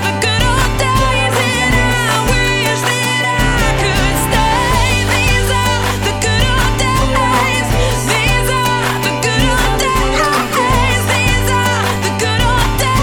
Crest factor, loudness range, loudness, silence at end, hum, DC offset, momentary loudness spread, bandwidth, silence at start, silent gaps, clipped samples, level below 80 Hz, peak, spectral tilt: 12 dB; 0 LU; -13 LUFS; 0 s; none; under 0.1%; 2 LU; over 20 kHz; 0 s; none; under 0.1%; -20 dBFS; 0 dBFS; -4 dB/octave